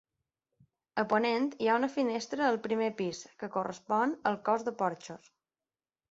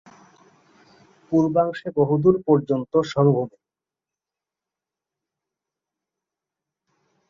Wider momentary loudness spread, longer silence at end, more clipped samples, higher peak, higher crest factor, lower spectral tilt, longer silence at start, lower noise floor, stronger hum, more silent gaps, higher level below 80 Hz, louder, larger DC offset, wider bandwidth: first, 9 LU vs 6 LU; second, 0.95 s vs 3.8 s; neither; second, -14 dBFS vs -4 dBFS; about the same, 20 dB vs 20 dB; second, -5 dB/octave vs -8.5 dB/octave; second, 0.95 s vs 1.3 s; about the same, under -90 dBFS vs -89 dBFS; neither; neither; second, -76 dBFS vs -62 dBFS; second, -32 LUFS vs -21 LUFS; neither; first, 8 kHz vs 7.2 kHz